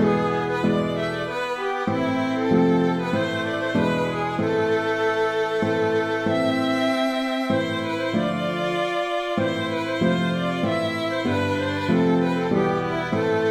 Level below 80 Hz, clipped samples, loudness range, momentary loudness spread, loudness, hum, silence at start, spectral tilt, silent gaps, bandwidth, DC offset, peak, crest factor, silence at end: -56 dBFS; under 0.1%; 1 LU; 4 LU; -23 LUFS; none; 0 s; -6.5 dB/octave; none; 14 kHz; under 0.1%; -8 dBFS; 14 dB; 0 s